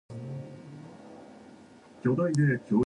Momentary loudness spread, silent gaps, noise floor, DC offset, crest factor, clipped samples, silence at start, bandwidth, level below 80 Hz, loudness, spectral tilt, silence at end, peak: 24 LU; none; -52 dBFS; under 0.1%; 16 dB; under 0.1%; 0.1 s; 10 kHz; -66 dBFS; -29 LUFS; -8 dB/octave; 0.05 s; -14 dBFS